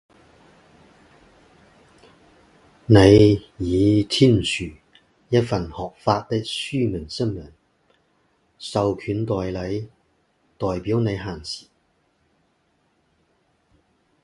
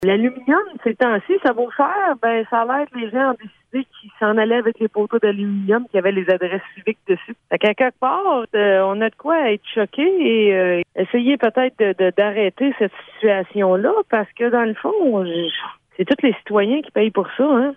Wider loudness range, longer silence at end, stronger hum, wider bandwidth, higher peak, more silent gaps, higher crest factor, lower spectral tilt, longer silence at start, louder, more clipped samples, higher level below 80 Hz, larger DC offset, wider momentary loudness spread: first, 12 LU vs 2 LU; first, 2.65 s vs 0 s; neither; first, 11.5 kHz vs 4 kHz; about the same, 0 dBFS vs -2 dBFS; neither; first, 22 dB vs 16 dB; second, -6.5 dB/octave vs -8 dB/octave; first, 2.9 s vs 0 s; about the same, -21 LUFS vs -19 LUFS; neither; first, -44 dBFS vs -66 dBFS; neither; first, 18 LU vs 7 LU